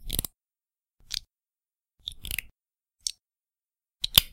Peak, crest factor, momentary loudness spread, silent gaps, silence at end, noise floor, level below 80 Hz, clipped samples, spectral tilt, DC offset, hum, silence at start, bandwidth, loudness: 0 dBFS; 34 dB; 19 LU; none; 0.05 s; under -90 dBFS; -46 dBFS; under 0.1%; -0.5 dB/octave; under 0.1%; none; 0 s; 17 kHz; -30 LUFS